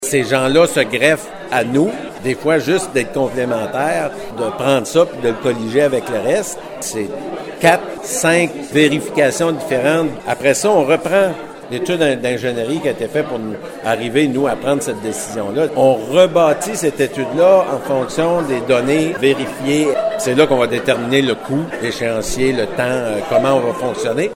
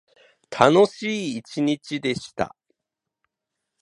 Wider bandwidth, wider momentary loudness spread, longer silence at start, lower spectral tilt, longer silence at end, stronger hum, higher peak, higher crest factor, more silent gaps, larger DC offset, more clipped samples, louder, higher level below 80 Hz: first, 16.5 kHz vs 11 kHz; second, 9 LU vs 14 LU; second, 0 s vs 0.5 s; about the same, -4.5 dB/octave vs -5.5 dB/octave; second, 0 s vs 1.35 s; neither; about the same, 0 dBFS vs 0 dBFS; second, 16 dB vs 24 dB; neither; neither; neither; first, -16 LUFS vs -22 LUFS; first, -48 dBFS vs -62 dBFS